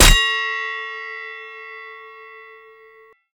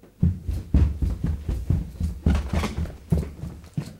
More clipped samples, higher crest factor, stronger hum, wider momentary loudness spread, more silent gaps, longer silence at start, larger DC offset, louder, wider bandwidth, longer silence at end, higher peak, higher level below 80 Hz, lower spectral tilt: neither; about the same, 22 dB vs 18 dB; neither; first, 23 LU vs 10 LU; neither; about the same, 0 s vs 0.05 s; neither; first, -20 LUFS vs -27 LUFS; first, over 20 kHz vs 14 kHz; first, 0.9 s vs 0 s; first, 0 dBFS vs -8 dBFS; about the same, -26 dBFS vs -28 dBFS; second, -1.5 dB/octave vs -7.5 dB/octave